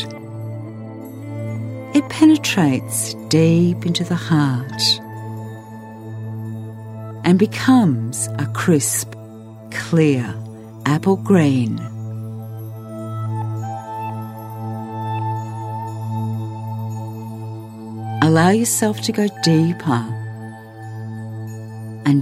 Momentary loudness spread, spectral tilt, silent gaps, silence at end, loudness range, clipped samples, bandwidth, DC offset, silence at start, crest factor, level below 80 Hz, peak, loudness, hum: 18 LU; -5.5 dB/octave; none; 0 s; 9 LU; under 0.1%; 16 kHz; under 0.1%; 0 s; 18 dB; -60 dBFS; 0 dBFS; -19 LUFS; none